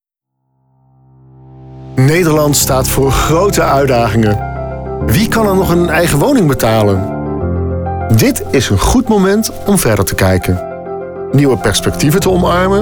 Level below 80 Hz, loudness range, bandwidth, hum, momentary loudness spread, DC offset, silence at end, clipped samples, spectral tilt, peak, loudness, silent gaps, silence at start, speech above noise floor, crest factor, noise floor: -26 dBFS; 1 LU; over 20 kHz; none; 8 LU; under 0.1%; 0 s; under 0.1%; -5.5 dB/octave; -2 dBFS; -12 LUFS; none; 1.55 s; 59 dB; 10 dB; -69 dBFS